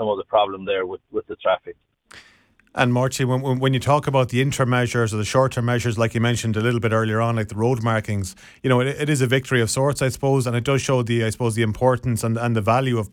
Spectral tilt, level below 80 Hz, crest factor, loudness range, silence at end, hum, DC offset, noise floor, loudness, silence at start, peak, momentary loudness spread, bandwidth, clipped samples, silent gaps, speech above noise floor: -5.5 dB/octave; -50 dBFS; 18 dB; 3 LU; 0.05 s; none; under 0.1%; -56 dBFS; -21 LUFS; 0 s; -2 dBFS; 5 LU; 16 kHz; under 0.1%; none; 36 dB